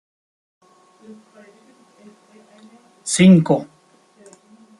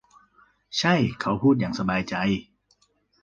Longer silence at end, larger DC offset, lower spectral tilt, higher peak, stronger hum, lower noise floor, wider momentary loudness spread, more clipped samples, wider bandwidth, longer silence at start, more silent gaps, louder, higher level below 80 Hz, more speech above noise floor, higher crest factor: first, 1.15 s vs 0.8 s; neither; about the same, -6 dB/octave vs -5.5 dB/octave; first, -2 dBFS vs -6 dBFS; second, none vs 50 Hz at -45 dBFS; second, -54 dBFS vs -66 dBFS; first, 22 LU vs 6 LU; neither; first, 11.5 kHz vs 7.6 kHz; first, 3.05 s vs 0.7 s; neither; first, -15 LUFS vs -24 LUFS; second, -60 dBFS vs -54 dBFS; second, 37 dB vs 43 dB; about the same, 20 dB vs 20 dB